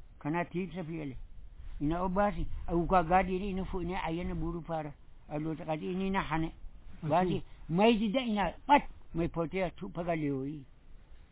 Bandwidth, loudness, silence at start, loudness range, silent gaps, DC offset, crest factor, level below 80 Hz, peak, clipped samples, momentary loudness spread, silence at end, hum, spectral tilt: 4 kHz; -33 LUFS; 0 s; 5 LU; none; under 0.1%; 22 dB; -46 dBFS; -12 dBFS; under 0.1%; 14 LU; 0.1 s; none; -5.5 dB/octave